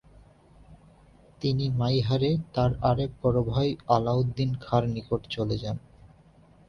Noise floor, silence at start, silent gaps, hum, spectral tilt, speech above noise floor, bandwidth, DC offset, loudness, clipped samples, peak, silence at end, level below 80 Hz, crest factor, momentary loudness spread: -56 dBFS; 0.7 s; none; none; -8.5 dB/octave; 30 dB; 6.6 kHz; under 0.1%; -27 LUFS; under 0.1%; -8 dBFS; 0.9 s; -48 dBFS; 20 dB; 7 LU